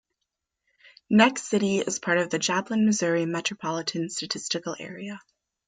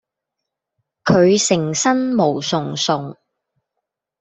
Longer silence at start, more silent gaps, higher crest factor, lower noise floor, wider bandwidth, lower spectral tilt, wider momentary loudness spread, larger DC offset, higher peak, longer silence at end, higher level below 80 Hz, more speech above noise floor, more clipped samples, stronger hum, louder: about the same, 1.1 s vs 1.05 s; neither; first, 24 dB vs 18 dB; about the same, -83 dBFS vs -81 dBFS; first, 9.4 kHz vs 8.4 kHz; about the same, -4 dB/octave vs -4 dB/octave; first, 15 LU vs 9 LU; neither; about the same, -4 dBFS vs -2 dBFS; second, 0.5 s vs 1.1 s; second, -70 dBFS vs -60 dBFS; second, 58 dB vs 64 dB; neither; neither; second, -25 LUFS vs -17 LUFS